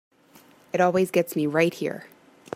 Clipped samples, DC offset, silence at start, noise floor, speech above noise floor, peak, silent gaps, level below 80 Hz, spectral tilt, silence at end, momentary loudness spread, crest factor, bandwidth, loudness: under 0.1%; under 0.1%; 0.75 s; -55 dBFS; 32 dB; -6 dBFS; none; -72 dBFS; -6 dB/octave; 0.5 s; 11 LU; 18 dB; 16 kHz; -24 LUFS